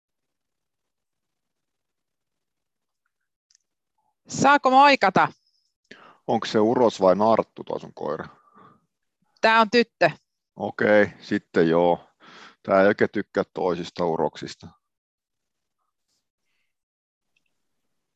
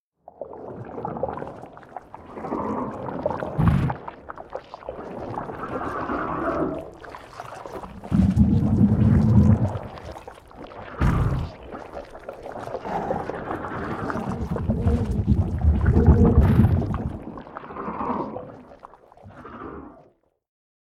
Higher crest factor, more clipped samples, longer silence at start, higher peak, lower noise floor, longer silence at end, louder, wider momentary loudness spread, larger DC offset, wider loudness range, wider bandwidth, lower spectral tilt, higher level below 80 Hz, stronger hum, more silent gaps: about the same, 20 dB vs 20 dB; neither; first, 4.3 s vs 0.4 s; about the same, -4 dBFS vs -4 dBFS; first, -86 dBFS vs -57 dBFS; first, 3.45 s vs 0.95 s; about the same, -21 LUFS vs -23 LUFS; second, 17 LU vs 22 LU; neither; about the same, 9 LU vs 10 LU; about the same, 8.4 kHz vs 8.2 kHz; second, -5 dB/octave vs -9.5 dB/octave; second, -64 dBFS vs -32 dBFS; neither; first, 5.76-5.83 s vs none